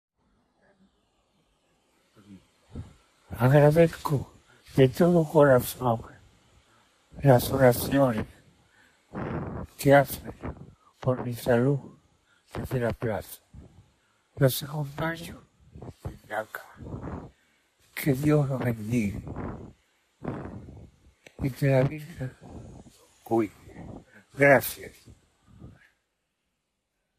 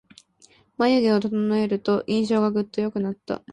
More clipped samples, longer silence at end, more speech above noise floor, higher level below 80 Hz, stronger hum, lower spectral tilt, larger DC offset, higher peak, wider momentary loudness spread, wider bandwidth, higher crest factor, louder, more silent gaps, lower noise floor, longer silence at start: neither; first, 1.5 s vs 0 s; first, 56 dB vs 35 dB; first, -52 dBFS vs -62 dBFS; neither; about the same, -6.5 dB/octave vs -7 dB/octave; neither; first, -6 dBFS vs -10 dBFS; first, 24 LU vs 8 LU; first, 15.5 kHz vs 9.8 kHz; first, 22 dB vs 14 dB; about the same, -25 LUFS vs -23 LUFS; neither; first, -80 dBFS vs -57 dBFS; first, 2.3 s vs 0.8 s